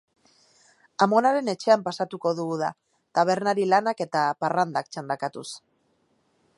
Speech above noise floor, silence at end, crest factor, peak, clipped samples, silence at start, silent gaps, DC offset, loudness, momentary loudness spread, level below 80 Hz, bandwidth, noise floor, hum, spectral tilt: 44 dB; 1 s; 20 dB; -6 dBFS; under 0.1%; 1 s; none; under 0.1%; -24 LUFS; 11 LU; -78 dBFS; 11.5 kHz; -68 dBFS; none; -5 dB/octave